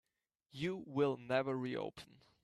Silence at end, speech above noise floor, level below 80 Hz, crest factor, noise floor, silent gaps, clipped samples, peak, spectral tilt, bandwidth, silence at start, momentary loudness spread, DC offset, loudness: 0.4 s; 44 dB; -78 dBFS; 20 dB; -82 dBFS; none; under 0.1%; -22 dBFS; -7 dB/octave; 12 kHz; 0.55 s; 20 LU; under 0.1%; -39 LUFS